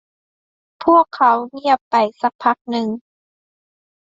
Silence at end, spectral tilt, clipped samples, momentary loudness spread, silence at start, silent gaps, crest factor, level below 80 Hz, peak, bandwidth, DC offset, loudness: 1.1 s; -6 dB/octave; under 0.1%; 9 LU; 0.8 s; 1.81-1.91 s, 2.35-2.39 s, 2.61-2.65 s; 18 dB; -64 dBFS; -2 dBFS; 7.8 kHz; under 0.1%; -17 LUFS